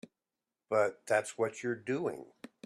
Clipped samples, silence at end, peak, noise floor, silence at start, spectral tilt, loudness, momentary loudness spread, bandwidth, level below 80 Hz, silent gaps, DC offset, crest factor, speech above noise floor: under 0.1%; 0.4 s; -16 dBFS; under -90 dBFS; 0.7 s; -5 dB/octave; -34 LUFS; 10 LU; 13 kHz; -80 dBFS; none; under 0.1%; 20 dB; over 57 dB